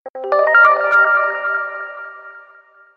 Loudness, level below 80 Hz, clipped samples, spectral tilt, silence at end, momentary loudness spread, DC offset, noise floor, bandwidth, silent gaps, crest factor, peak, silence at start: -13 LUFS; -74 dBFS; under 0.1%; -2.5 dB/octave; 0.55 s; 20 LU; under 0.1%; -47 dBFS; 6.6 kHz; 0.10-0.14 s; 16 dB; 0 dBFS; 0.05 s